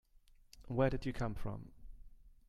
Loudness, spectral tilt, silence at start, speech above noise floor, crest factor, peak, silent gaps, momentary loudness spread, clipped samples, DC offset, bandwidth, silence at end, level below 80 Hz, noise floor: -39 LUFS; -7.5 dB/octave; 0.55 s; 28 dB; 22 dB; -18 dBFS; none; 15 LU; under 0.1%; under 0.1%; 13 kHz; 0.15 s; -50 dBFS; -65 dBFS